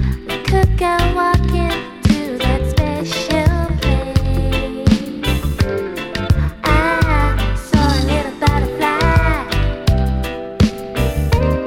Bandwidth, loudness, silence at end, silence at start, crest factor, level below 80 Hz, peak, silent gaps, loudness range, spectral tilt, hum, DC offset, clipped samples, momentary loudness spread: 17 kHz; -17 LUFS; 0 s; 0 s; 16 dB; -20 dBFS; 0 dBFS; none; 2 LU; -6 dB/octave; none; under 0.1%; under 0.1%; 5 LU